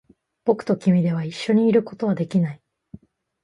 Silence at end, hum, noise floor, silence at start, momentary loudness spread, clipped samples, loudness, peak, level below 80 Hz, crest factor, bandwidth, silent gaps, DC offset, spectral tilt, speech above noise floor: 0.9 s; none; -46 dBFS; 0.45 s; 8 LU; under 0.1%; -21 LUFS; -6 dBFS; -64 dBFS; 16 dB; 11 kHz; none; under 0.1%; -8 dB/octave; 26 dB